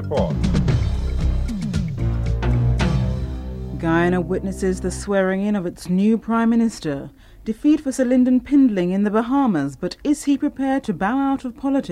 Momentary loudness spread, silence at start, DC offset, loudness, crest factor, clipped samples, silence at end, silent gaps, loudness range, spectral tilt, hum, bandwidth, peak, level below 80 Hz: 9 LU; 0 s; under 0.1%; -21 LUFS; 14 dB; under 0.1%; 0 s; none; 3 LU; -7 dB/octave; none; 13 kHz; -6 dBFS; -28 dBFS